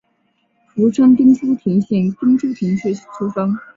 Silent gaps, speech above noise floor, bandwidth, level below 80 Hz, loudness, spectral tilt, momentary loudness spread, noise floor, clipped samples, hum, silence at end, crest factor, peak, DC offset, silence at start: none; 49 dB; 7.6 kHz; -58 dBFS; -16 LUFS; -8.5 dB/octave; 12 LU; -64 dBFS; under 0.1%; none; 0.15 s; 14 dB; -2 dBFS; under 0.1%; 0.75 s